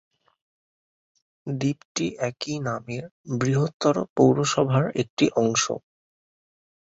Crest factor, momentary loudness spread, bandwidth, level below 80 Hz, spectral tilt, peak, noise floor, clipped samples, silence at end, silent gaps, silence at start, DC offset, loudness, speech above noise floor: 20 dB; 13 LU; 8 kHz; -62 dBFS; -5 dB/octave; -6 dBFS; under -90 dBFS; under 0.1%; 1.05 s; 1.85-1.95 s, 3.11-3.24 s, 3.74-3.80 s, 4.09-4.16 s, 5.10-5.17 s; 1.45 s; under 0.1%; -24 LUFS; over 66 dB